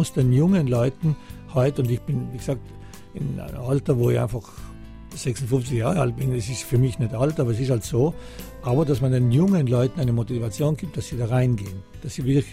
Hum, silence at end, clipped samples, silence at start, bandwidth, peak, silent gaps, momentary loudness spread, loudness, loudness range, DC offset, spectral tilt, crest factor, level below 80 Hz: none; 0 s; under 0.1%; 0 s; 15.5 kHz; -8 dBFS; none; 15 LU; -23 LUFS; 4 LU; under 0.1%; -7.5 dB/octave; 16 dB; -42 dBFS